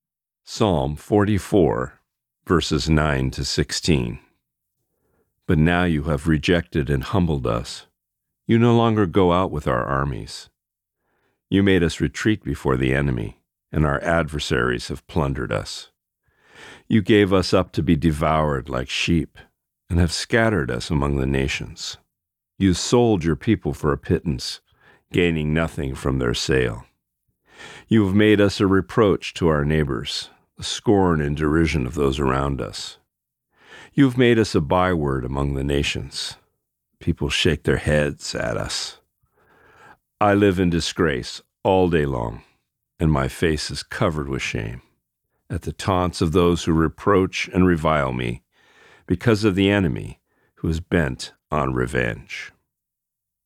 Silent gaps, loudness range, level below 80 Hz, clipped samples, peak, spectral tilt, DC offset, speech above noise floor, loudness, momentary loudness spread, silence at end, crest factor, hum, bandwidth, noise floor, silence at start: none; 3 LU; -36 dBFS; under 0.1%; -4 dBFS; -6 dB/octave; under 0.1%; 63 dB; -21 LUFS; 13 LU; 0.95 s; 18 dB; none; 15 kHz; -83 dBFS; 0.5 s